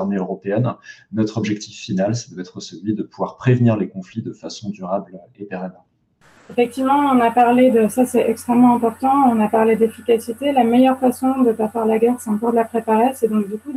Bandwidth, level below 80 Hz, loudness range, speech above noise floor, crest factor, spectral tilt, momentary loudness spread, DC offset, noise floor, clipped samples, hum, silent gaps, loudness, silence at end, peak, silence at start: 15.5 kHz; -66 dBFS; 8 LU; 38 dB; 14 dB; -7 dB/octave; 15 LU; under 0.1%; -55 dBFS; under 0.1%; none; none; -18 LUFS; 0 s; -4 dBFS; 0 s